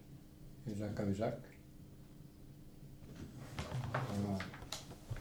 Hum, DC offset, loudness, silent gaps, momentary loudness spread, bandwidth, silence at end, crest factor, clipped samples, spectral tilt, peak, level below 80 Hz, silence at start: none; under 0.1%; -43 LUFS; none; 18 LU; over 20 kHz; 0 s; 20 dB; under 0.1%; -6 dB/octave; -24 dBFS; -58 dBFS; 0 s